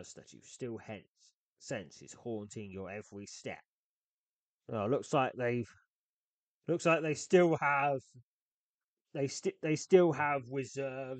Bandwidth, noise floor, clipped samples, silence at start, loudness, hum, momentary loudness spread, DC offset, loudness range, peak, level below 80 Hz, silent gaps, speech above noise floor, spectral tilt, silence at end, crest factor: 9 kHz; under -90 dBFS; under 0.1%; 0 s; -33 LUFS; none; 20 LU; under 0.1%; 13 LU; -12 dBFS; -78 dBFS; 1.08-1.15 s, 1.34-1.56 s, 3.68-4.60 s, 5.87-6.61 s, 8.23-9.05 s; over 56 dB; -5.5 dB/octave; 0 s; 22 dB